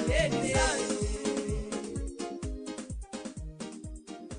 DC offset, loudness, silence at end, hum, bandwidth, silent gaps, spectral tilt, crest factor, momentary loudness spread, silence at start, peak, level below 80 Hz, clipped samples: under 0.1%; -33 LUFS; 0 s; none; 10.5 kHz; none; -4 dB/octave; 18 dB; 15 LU; 0 s; -14 dBFS; -40 dBFS; under 0.1%